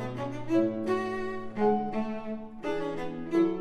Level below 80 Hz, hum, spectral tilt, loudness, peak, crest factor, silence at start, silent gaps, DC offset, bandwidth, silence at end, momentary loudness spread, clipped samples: -56 dBFS; none; -7.5 dB/octave; -31 LUFS; -14 dBFS; 16 dB; 0 s; none; under 0.1%; 9.6 kHz; 0 s; 9 LU; under 0.1%